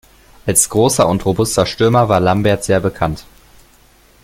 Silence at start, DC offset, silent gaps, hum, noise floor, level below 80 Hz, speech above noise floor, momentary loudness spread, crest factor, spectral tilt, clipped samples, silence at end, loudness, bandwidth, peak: 0.45 s; under 0.1%; none; none; -49 dBFS; -40 dBFS; 35 dB; 9 LU; 16 dB; -4.5 dB/octave; under 0.1%; 1 s; -14 LUFS; 17 kHz; 0 dBFS